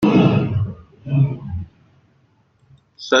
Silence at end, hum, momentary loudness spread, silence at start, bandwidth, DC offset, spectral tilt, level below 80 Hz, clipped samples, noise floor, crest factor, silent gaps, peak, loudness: 0 s; none; 21 LU; 0 s; 6.6 kHz; under 0.1%; -6.5 dB/octave; -48 dBFS; under 0.1%; -59 dBFS; 18 dB; none; -2 dBFS; -20 LUFS